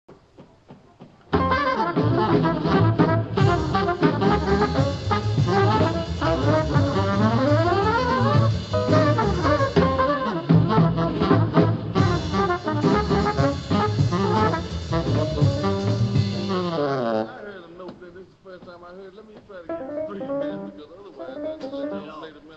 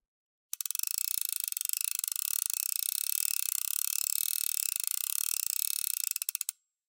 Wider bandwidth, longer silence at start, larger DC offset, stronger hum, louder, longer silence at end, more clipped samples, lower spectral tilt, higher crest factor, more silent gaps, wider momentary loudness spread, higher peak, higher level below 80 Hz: second, 8 kHz vs 17.5 kHz; second, 0.1 s vs 0.55 s; neither; neither; first, -22 LUFS vs -30 LUFS; second, 0 s vs 0.35 s; neither; first, -7.5 dB/octave vs 12 dB/octave; second, 18 dB vs 24 dB; neither; first, 17 LU vs 3 LU; first, -4 dBFS vs -8 dBFS; first, -40 dBFS vs under -90 dBFS